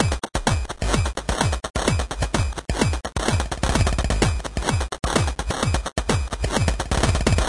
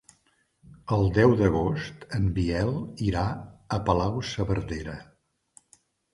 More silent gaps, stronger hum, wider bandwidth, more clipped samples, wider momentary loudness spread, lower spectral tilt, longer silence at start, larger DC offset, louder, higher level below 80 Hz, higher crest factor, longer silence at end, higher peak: first, 1.70-1.74 s vs none; neither; about the same, 11.5 kHz vs 11.5 kHz; neither; second, 3 LU vs 14 LU; second, -4.5 dB/octave vs -7.5 dB/octave; second, 0 s vs 0.85 s; neither; first, -23 LUFS vs -26 LUFS; first, -28 dBFS vs -42 dBFS; about the same, 18 dB vs 20 dB; second, 0 s vs 1.1 s; about the same, -4 dBFS vs -6 dBFS